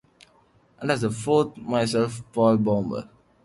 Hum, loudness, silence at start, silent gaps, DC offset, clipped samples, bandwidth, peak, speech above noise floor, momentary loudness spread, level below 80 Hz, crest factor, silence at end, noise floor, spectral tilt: none; -24 LUFS; 0.8 s; none; under 0.1%; under 0.1%; 11.5 kHz; -8 dBFS; 37 dB; 9 LU; -58 dBFS; 16 dB; 0.4 s; -60 dBFS; -6 dB/octave